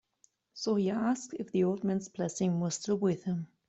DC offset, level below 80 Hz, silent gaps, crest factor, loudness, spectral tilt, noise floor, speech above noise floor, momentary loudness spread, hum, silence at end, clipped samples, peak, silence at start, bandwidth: under 0.1%; -72 dBFS; none; 14 dB; -32 LUFS; -6 dB/octave; -70 dBFS; 39 dB; 7 LU; none; 0.25 s; under 0.1%; -18 dBFS; 0.55 s; 8.2 kHz